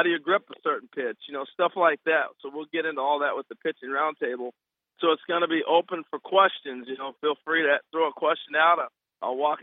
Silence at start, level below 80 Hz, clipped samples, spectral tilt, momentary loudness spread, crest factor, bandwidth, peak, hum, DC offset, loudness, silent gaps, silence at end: 0 s; under -90 dBFS; under 0.1%; -7.5 dB/octave; 13 LU; 20 dB; 4 kHz; -6 dBFS; none; under 0.1%; -26 LUFS; none; 0 s